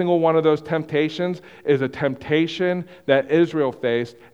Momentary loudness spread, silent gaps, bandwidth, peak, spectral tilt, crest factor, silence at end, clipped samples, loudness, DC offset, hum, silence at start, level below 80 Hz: 8 LU; none; 8 kHz; -2 dBFS; -7 dB/octave; 18 dB; 0.25 s; under 0.1%; -21 LUFS; under 0.1%; none; 0 s; -60 dBFS